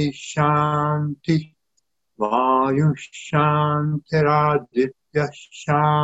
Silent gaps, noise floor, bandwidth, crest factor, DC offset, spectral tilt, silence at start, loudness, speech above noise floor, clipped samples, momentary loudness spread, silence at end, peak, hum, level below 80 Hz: none; -73 dBFS; 8 kHz; 16 dB; under 0.1%; -7 dB/octave; 0 s; -21 LUFS; 53 dB; under 0.1%; 7 LU; 0 s; -4 dBFS; none; -56 dBFS